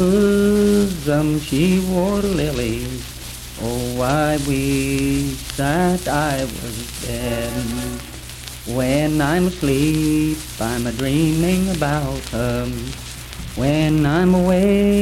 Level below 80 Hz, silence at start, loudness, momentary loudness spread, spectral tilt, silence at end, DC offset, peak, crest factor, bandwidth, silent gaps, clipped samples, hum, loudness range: -34 dBFS; 0 s; -19 LUFS; 13 LU; -5.5 dB/octave; 0 s; under 0.1%; -6 dBFS; 14 dB; 17 kHz; none; under 0.1%; none; 4 LU